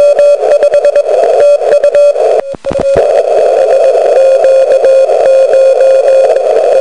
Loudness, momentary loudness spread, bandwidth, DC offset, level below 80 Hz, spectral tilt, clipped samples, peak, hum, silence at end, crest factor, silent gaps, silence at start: -7 LUFS; 3 LU; 10.5 kHz; 2%; -44 dBFS; -4 dB/octave; 2%; 0 dBFS; none; 0 s; 6 dB; none; 0 s